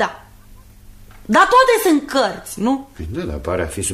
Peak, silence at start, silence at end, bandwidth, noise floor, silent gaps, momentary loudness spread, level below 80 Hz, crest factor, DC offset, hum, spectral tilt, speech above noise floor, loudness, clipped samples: -2 dBFS; 0 s; 0 s; 15.5 kHz; -43 dBFS; none; 14 LU; -38 dBFS; 16 dB; under 0.1%; none; -4 dB/octave; 26 dB; -17 LUFS; under 0.1%